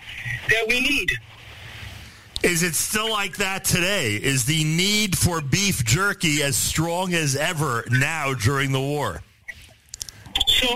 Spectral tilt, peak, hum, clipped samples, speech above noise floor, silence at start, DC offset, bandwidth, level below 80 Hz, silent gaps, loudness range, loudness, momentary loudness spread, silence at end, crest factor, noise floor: -3 dB/octave; -6 dBFS; none; under 0.1%; 22 dB; 0 s; 0.6%; 16 kHz; -42 dBFS; none; 3 LU; -21 LUFS; 18 LU; 0 s; 16 dB; -44 dBFS